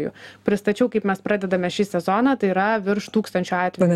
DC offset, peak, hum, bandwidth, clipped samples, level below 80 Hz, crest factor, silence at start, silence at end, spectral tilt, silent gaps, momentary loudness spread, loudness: under 0.1%; -4 dBFS; none; 13.5 kHz; under 0.1%; -60 dBFS; 16 dB; 0 s; 0 s; -6.5 dB/octave; none; 4 LU; -22 LUFS